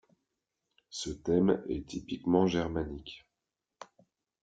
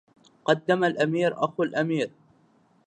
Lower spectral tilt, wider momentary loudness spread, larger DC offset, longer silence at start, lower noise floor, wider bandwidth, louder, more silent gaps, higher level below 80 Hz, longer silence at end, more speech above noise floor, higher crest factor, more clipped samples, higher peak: about the same, -6 dB/octave vs -6 dB/octave; first, 17 LU vs 7 LU; neither; first, 0.9 s vs 0.45 s; first, -88 dBFS vs -62 dBFS; about the same, 9.2 kHz vs 9.4 kHz; second, -31 LUFS vs -25 LUFS; neither; first, -56 dBFS vs -74 dBFS; second, 0.6 s vs 0.8 s; first, 57 dB vs 38 dB; about the same, 22 dB vs 20 dB; neither; second, -12 dBFS vs -6 dBFS